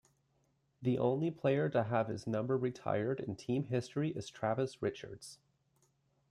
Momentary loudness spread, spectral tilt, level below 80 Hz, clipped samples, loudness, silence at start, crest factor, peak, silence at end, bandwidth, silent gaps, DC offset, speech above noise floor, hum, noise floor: 7 LU; -7 dB/octave; -72 dBFS; under 0.1%; -36 LUFS; 0.8 s; 18 dB; -18 dBFS; 0.95 s; 12 kHz; none; under 0.1%; 41 dB; none; -76 dBFS